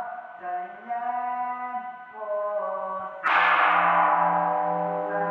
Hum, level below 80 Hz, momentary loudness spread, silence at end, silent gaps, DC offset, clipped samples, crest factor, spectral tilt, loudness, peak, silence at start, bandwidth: none; -86 dBFS; 15 LU; 0 s; none; under 0.1%; under 0.1%; 18 dB; -6 dB/octave; -25 LUFS; -8 dBFS; 0 s; 6.8 kHz